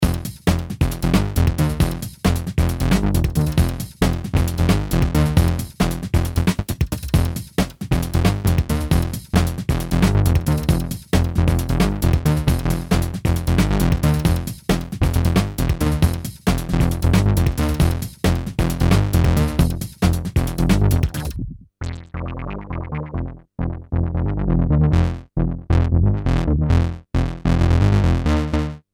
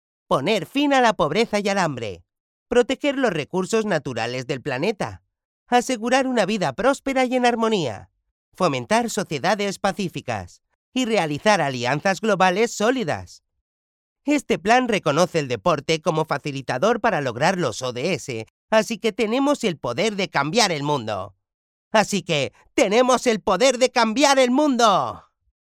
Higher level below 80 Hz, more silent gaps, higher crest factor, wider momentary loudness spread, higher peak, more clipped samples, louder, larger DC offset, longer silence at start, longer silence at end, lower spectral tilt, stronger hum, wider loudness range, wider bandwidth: first, -24 dBFS vs -56 dBFS; second, none vs 2.40-2.66 s, 5.45-5.66 s, 8.31-8.52 s, 10.75-10.92 s, 13.61-14.16 s, 18.50-18.68 s, 21.54-21.91 s; about the same, 18 dB vs 18 dB; about the same, 7 LU vs 9 LU; about the same, -2 dBFS vs -2 dBFS; neither; about the same, -20 LUFS vs -21 LUFS; neither; second, 0 s vs 0.3 s; second, 0.15 s vs 0.6 s; first, -6.5 dB/octave vs -4 dB/octave; neither; about the same, 3 LU vs 5 LU; first, 18.5 kHz vs 15.5 kHz